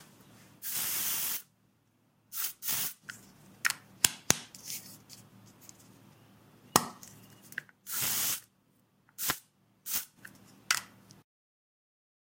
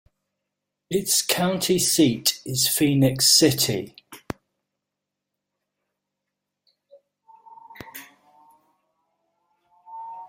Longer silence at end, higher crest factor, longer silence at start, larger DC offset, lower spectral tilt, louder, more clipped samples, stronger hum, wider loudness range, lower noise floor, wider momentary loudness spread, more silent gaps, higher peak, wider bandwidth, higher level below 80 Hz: first, 1.35 s vs 0 s; first, 38 dB vs 22 dB; second, 0 s vs 0.9 s; neither; second, -0.5 dB/octave vs -3 dB/octave; second, -32 LUFS vs -20 LUFS; neither; neither; about the same, 4 LU vs 6 LU; second, -70 dBFS vs -84 dBFS; about the same, 24 LU vs 24 LU; neither; first, 0 dBFS vs -4 dBFS; about the same, 16.5 kHz vs 16.5 kHz; second, -70 dBFS vs -60 dBFS